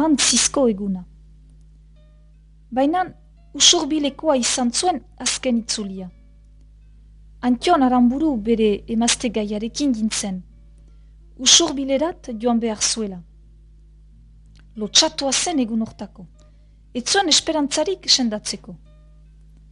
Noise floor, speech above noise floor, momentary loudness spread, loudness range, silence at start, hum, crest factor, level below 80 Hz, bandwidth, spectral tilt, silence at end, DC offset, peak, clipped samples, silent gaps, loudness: -48 dBFS; 29 dB; 16 LU; 4 LU; 0 s; none; 22 dB; -46 dBFS; 11 kHz; -2 dB/octave; 0.95 s; under 0.1%; 0 dBFS; under 0.1%; none; -19 LUFS